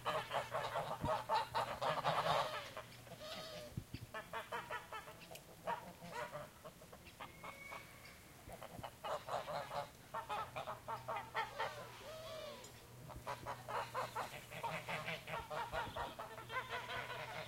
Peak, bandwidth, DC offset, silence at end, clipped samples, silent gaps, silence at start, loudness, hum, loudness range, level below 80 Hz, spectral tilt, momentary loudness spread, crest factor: -24 dBFS; 16 kHz; under 0.1%; 0 s; under 0.1%; none; 0 s; -45 LUFS; none; 9 LU; -68 dBFS; -3.5 dB/octave; 15 LU; 22 dB